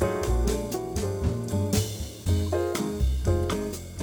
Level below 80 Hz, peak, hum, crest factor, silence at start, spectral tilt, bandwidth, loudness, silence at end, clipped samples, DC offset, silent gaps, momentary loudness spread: -32 dBFS; -10 dBFS; none; 16 dB; 0 s; -6 dB/octave; 19 kHz; -28 LUFS; 0 s; under 0.1%; under 0.1%; none; 5 LU